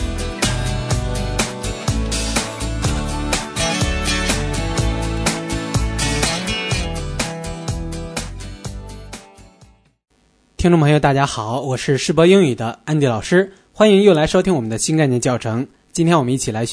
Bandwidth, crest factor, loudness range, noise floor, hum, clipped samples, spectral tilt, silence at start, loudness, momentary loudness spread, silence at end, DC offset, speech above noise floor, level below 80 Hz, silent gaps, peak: 11 kHz; 18 dB; 10 LU; -58 dBFS; none; under 0.1%; -5 dB/octave; 0 s; -18 LUFS; 13 LU; 0 s; under 0.1%; 43 dB; -28 dBFS; none; 0 dBFS